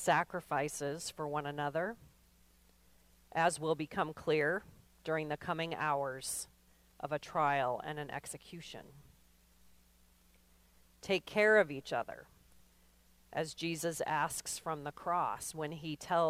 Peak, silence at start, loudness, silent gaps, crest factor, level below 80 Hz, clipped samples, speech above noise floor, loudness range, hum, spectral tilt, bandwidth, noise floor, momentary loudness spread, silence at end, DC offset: -16 dBFS; 0 s; -36 LUFS; none; 22 dB; -68 dBFS; under 0.1%; 31 dB; 5 LU; none; -4 dB/octave; 16 kHz; -67 dBFS; 15 LU; 0 s; under 0.1%